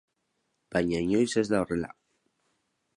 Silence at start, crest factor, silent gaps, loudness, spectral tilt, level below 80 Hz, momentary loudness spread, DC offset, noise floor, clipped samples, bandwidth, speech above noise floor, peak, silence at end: 0.7 s; 20 dB; none; -28 LUFS; -5.5 dB/octave; -56 dBFS; 7 LU; under 0.1%; -78 dBFS; under 0.1%; 11.5 kHz; 51 dB; -12 dBFS; 1.1 s